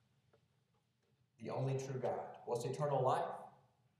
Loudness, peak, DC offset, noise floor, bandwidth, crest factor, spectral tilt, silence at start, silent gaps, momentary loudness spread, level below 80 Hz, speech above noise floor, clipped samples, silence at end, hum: -40 LUFS; -24 dBFS; under 0.1%; -80 dBFS; 13 kHz; 20 dB; -6.5 dB/octave; 1.4 s; none; 15 LU; -88 dBFS; 41 dB; under 0.1%; 0.5 s; none